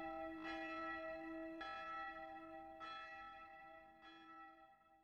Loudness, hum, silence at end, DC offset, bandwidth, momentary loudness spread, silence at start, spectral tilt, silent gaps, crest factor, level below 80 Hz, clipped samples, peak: -51 LUFS; none; 0 s; under 0.1%; 9 kHz; 14 LU; 0 s; -5 dB/octave; none; 14 dB; -76 dBFS; under 0.1%; -38 dBFS